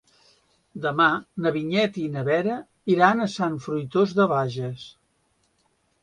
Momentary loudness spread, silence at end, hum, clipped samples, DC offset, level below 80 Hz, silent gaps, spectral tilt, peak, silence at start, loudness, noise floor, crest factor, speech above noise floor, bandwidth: 12 LU; 1.15 s; none; under 0.1%; under 0.1%; -64 dBFS; none; -6.5 dB/octave; -2 dBFS; 0.75 s; -23 LUFS; -68 dBFS; 22 dB; 45 dB; 11 kHz